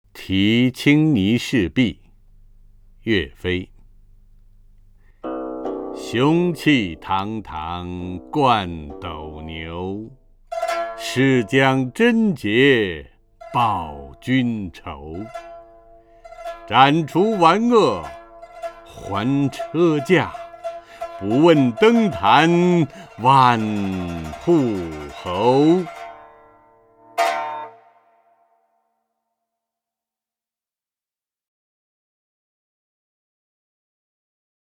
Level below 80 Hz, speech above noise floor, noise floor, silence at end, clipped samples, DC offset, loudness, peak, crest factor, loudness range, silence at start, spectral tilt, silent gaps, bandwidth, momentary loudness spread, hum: -48 dBFS; over 72 dB; under -90 dBFS; 7.05 s; under 0.1%; under 0.1%; -19 LUFS; 0 dBFS; 20 dB; 11 LU; 0.15 s; -6.5 dB/octave; none; 16 kHz; 19 LU; none